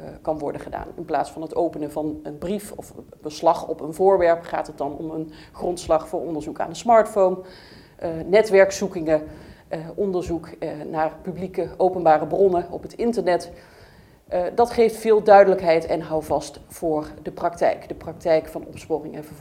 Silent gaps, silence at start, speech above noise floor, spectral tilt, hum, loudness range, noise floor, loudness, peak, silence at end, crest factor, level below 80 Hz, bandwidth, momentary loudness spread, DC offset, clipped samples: none; 0 s; 28 dB; -5.5 dB/octave; none; 6 LU; -49 dBFS; -22 LUFS; 0 dBFS; 0 s; 22 dB; -50 dBFS; 16 kHz; 16 LU; under 0.1%; under 0.1%